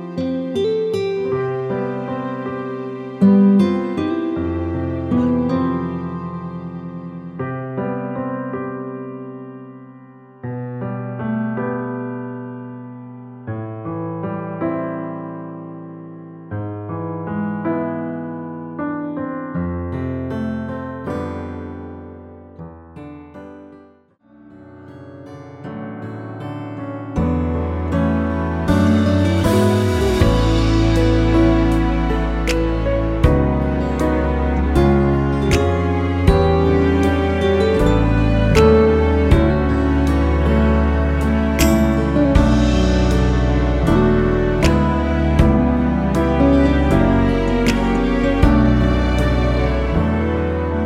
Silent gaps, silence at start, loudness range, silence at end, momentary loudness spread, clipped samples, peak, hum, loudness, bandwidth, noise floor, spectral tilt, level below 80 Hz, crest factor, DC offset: none; 0 s; 13 LU; 0 s; 17 LU; under 0.1%; 0 dBFS; none; -18 LUFS; 15 kHz; -51 dBFS; -7.5 dB/octave; -24 dBFS; 18 dB; under 0.1%